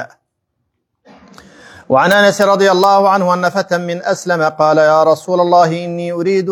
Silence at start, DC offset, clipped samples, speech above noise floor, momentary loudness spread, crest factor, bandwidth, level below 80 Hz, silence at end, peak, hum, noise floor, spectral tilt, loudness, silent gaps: 0 s; under 0.1%; under 0.1%; 58 dB; 8 LU; 14 dB; 19 kHz; -62 dBFS; 0 s; 0 dBFS; none; -70 dBFS; -5 dB/octave; -12 LUFS; none